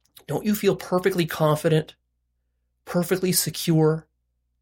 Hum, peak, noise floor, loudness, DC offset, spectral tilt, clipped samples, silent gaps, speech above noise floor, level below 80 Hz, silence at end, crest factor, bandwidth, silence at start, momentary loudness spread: 60 Hz at -50 dBFS; -6 dBFS; -74 dBFS; -23 LUFS; under 0.1%; -5 dB/octave; under 0.1%; none; 52 dB; -58 dBFS; 0.6 s; 18 dB; 17 kHz; 0.3 s; 8 LU